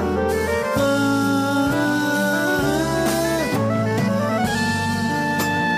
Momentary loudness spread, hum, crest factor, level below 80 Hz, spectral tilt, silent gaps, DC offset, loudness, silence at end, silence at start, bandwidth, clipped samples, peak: 2 LU; none; 12 dB; -44 dBFS; -5 dB/octave; none; under 0.1%; -20 LUFS; 0 s; 0 s; 15.5 kHz; under 0.1%; -8 dBFS